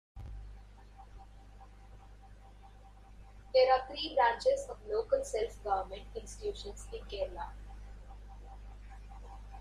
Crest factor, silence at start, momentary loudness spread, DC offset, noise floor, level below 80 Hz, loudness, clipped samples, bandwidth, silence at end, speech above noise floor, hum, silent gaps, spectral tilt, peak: 20 dB; 0.15 s; 28 LU; under 0.1%; -55 dBFS; -50 dBFS; -34 LUFS; under 0.1%; 11.5 kHz; 0 s; 22 dB; 50 Hz at -55 dBFS; none; -3.5 dB/octave; -16 dBFS